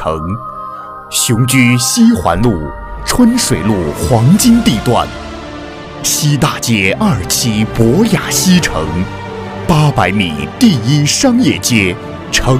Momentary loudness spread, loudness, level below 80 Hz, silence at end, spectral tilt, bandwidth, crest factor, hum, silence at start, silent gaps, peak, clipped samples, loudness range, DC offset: 15 LU; -11 LUFS; -30 dBFS; 0 s; -4.5 dB/octave; 16.5 kHz; 12 dB; none; 0 s; none; 0 dBFS; 0.1%; 2 LU; under 0.1%